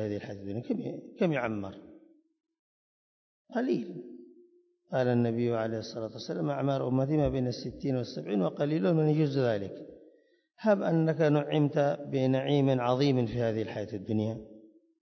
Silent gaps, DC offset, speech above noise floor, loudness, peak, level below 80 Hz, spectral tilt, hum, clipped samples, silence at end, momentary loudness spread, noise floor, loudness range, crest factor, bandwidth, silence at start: 2.59-3.45 s; under 0.1%; 36 dB; -30 LUFS; -12 dBFS; -58 dBFS; -8 dB/octave; none; under 0.1%; 0.4 s; 12 LU; -65 dBFS; 9 LU; 18 dB; 6.4 kHz; 0 s